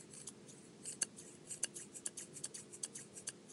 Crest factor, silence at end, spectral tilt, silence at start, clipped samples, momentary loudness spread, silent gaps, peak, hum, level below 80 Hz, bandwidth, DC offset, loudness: 32 dB; 0 s; -1 dB/octave; 0 s; under 0.1%; 11 LU; none; -18 dBFS; none; -88 dBFS; 15.5 kHz; under 0.1%; -46 LUFS